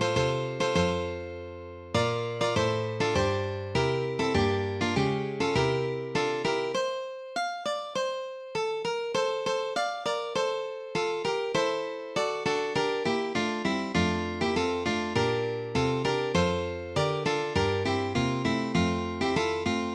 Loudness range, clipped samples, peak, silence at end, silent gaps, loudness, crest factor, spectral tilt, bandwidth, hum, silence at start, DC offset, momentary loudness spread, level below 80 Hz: 3 LU; under 0.1%; -12 dBFS; 0 s; none; -28 LUFS; 16 dB; -5 dB/octave; 11.5 kHz; none; 0 s; under 0.1%; 6 LU; -52 dBFS